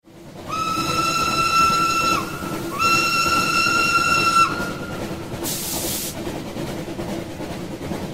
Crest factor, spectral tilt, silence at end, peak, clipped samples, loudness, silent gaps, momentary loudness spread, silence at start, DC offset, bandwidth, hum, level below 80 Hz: 18 dB; -3 dB/octave; 0 s; -4 dBFS; under 0.1%; -20 LUFS; none; 13 LU; 0.05 s; 0.5%; 16.5 kHz; none; -46 dBFS